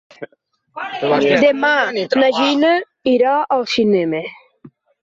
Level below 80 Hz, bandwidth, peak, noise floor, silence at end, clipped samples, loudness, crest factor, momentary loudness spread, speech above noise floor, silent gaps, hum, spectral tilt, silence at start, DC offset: -62 dBFS; 7.8 kHz; -2 dBFS; -61 dBFS; 0.35 s; under 0.1%; -15 LUFS; 14 dB; 19 LU; 45 dB; none; none; -5 dB/octave; 0.2 s; under 0.1%